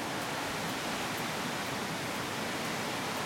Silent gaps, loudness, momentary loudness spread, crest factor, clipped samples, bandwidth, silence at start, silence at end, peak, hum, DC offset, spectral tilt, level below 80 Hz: none; -34 LUFS; 1 LU; 12 dB; under 0.1%; 16.5 kHz; 0 s; 0 s; -22 dBFS; none; under 0.1%; -3 dB/octave; -64 dBFS